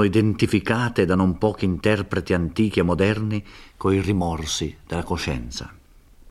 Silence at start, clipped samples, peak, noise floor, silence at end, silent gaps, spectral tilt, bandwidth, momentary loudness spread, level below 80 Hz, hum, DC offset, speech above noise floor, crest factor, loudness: 0 s; under 0.1%; -4 dBFS; -50 dBFS; 0 s; none; -6 dB/octave; 14 kHz; 9 LU; -42 dBFS; none; under 0.1%; 28 dB; 18 dB; -22 LUFS